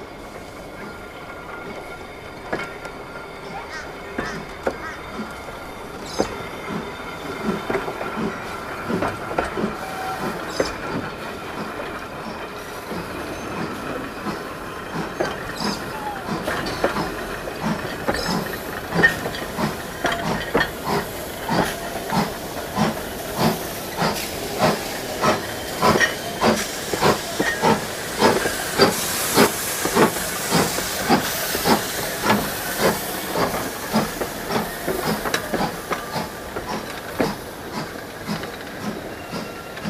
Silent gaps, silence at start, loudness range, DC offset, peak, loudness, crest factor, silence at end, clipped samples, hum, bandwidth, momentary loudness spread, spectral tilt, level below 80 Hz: none; 0 s; 10 LU; under 0.1%; 0 dBFS; -24 LUFS; 24 dB; 0 s; under 0.1%; none; 16 kHz; 13 LU; -3.5 dB/octave; -44 dBFS